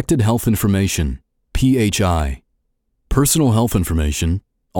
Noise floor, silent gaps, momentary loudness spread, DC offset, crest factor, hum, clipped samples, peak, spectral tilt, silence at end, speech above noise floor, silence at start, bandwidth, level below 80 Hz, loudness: -68 dBFS; none; 11 LU; under 0.1%; 16 dB; none; under 0.1%; -2 dBFS; -5.5 dB/octave; 0 s; 52 dB; 0 s; 18 kHz; -28 dBFS; -18 LUFS